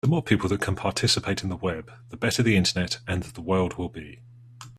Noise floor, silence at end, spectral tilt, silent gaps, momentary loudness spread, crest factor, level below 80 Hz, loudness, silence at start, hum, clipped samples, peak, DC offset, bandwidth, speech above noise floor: -46 dBFS; 0 s; -4.5 dB/octave; none; 15 LU; 20 dB; -52 dBFS; -25 LUFS; 0.05 s; none; under 0.1%; -6 dBFS; under 0.1%; 14 kHz; 21 dB